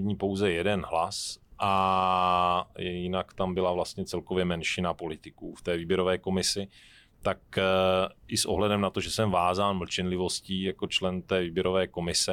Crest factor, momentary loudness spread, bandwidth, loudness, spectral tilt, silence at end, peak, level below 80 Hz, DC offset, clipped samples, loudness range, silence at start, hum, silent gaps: 16 dB; 9 LU; 16.5 kHz; -28 LUFS; -4 dB/octave; 0 s; -12 dBFS; -54 dBFS; under 0.1%; under 0.1%; 3 LU; 0 s; none; none